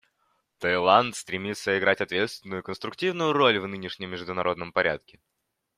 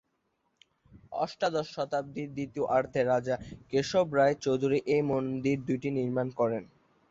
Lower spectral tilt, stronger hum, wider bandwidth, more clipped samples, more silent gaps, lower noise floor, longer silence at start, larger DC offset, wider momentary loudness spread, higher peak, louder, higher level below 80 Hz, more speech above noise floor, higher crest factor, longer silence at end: second, -4 dB/octave vs -6.5 dB/octave; neither; first, 15 kHz vs 7.8 kHz; neither; neither; second, -72 dBFS vs -77 dBFS; second, 0.6 s vs 0.95 s; neither; first, 14 LU vs 9 LU; first, -4 dBFS vs -14 dBFS; first, -26 LUFS vs -30 LUFS; about the same, -66 dBFS vs -62 dBFS; about the same, 46 dB vs 48 dB; first, 22 dB vs 16 dB; first, 0.8 s vs 0.45 s